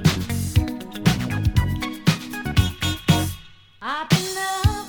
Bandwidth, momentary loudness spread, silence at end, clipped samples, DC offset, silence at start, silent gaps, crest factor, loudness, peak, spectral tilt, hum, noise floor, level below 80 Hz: over 20 kHz; 8 LU; 0 s; under 0.1%; under 0.1%; 0 s; none; 20 dB; -22 LUFS; -2 dBFS; -5 dB/octave; none; -43 dBFS; -34 dBFS